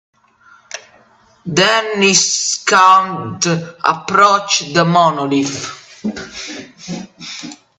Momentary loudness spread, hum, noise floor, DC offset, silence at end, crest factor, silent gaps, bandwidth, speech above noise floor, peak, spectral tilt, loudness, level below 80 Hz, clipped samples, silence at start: 19 LU; none; -50 dBFS; under 0.1%; 0.25 s; 16 dB; none; 10.5 kHz; 35 dB; 0 dBFS; -3 dB/octave; -13 LUFS; -58 dBFS; under 0.1%; 0.75 s